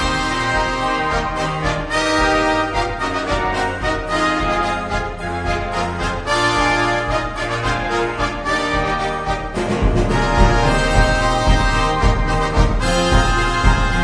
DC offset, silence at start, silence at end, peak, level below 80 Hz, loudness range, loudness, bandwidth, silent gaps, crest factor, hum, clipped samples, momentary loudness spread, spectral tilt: under 0.1%; 0 s; 0 s; 0 dBFS; -22 dBFS; 3 LU; -18 LUFS; 10.5 kHz; none; 18 dB; none; under 0.1%; 6 LU; -5 dB/octave